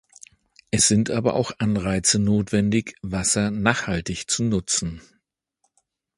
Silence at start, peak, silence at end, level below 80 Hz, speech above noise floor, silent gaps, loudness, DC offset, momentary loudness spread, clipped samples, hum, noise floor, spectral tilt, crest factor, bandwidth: 0.75 s; 0 dBFS; 1.2 s; -46 dBFS; 51 dB; none; -22 LUFS; under 0.1%; 9 LU; under 0.1%; none; -73 dBFS; -4 dB/octave; 24 dB; 11.5 kHz